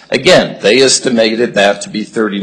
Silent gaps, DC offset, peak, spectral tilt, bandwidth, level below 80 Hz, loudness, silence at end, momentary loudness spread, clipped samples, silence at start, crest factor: none; under 0.1%; 0 dBFS; -3 dB/octave; 12 kHz; -46 dBFS; -10 LUFS; 0 s; 8 LU; 0.1%; 0.1 s; 10 dB